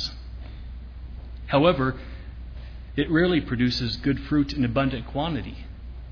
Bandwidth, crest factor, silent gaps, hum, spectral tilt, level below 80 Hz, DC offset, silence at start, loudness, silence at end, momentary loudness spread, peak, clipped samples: 5.4 kHz; 18 dB; none; none; -7 dB/octave; -38 dBFS; under 0.1%; 0 s; -24 LUFS; 0 s; 20 LU; -8 dBFS; under 0.1%